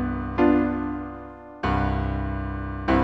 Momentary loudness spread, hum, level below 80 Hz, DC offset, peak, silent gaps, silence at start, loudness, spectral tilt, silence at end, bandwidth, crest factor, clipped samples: 14 LU; none; -34 dBFS; under 0.1%; -8 dBFS; none; 0 s; -25 LUFS; -9 dB/octave; 0 s; 6.2 kHz; 16 dB; under 0.1%